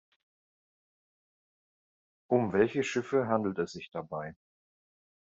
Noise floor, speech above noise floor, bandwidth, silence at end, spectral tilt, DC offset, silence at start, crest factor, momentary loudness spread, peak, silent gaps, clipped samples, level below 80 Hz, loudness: under -90 dBFS; over 60 dB; 7.8 kHz; 1.05 s; -5.5 dB/octave; under 0.1%; 2.3 s; 22 dB; 12 LU; -12 dBFS; none; under 0.1%; -72 dBFS; -31 LUFS